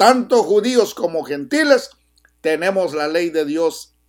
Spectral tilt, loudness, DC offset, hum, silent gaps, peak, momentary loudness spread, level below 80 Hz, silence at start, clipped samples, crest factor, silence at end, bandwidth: -3.5 dB/octave; -18 LUFS; under 0.1%; none; none; 0 dBFS; 8 LU; -62 dBFS; 0 s; under 0.1%; 18 dB; 0.25 s; 17 kHz